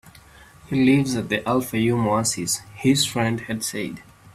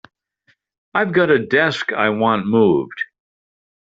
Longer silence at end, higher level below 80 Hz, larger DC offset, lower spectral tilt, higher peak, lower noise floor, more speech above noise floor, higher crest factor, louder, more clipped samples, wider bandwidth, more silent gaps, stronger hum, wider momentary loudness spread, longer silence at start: second, 0.3 s vs 0.9 s; first, -54 dBFS vs -60 dBFS; neither; about the same, -4.5 dB/octave vs -4 dB/octave; second, -6 dBFS vs -2 dBFS; second, -48 dBFS vs -62 dBFS; second, 26 dB vs 46 dB; about the same, 16 dB vs 16 dB; second, -22 LUFS vs -17 LUFS; neither; first, 15.5 kHz vs 7.8 kHz; neither; neither; about the same, 9 LU vs 11 LU; second, 0.05 s vs 0.95 s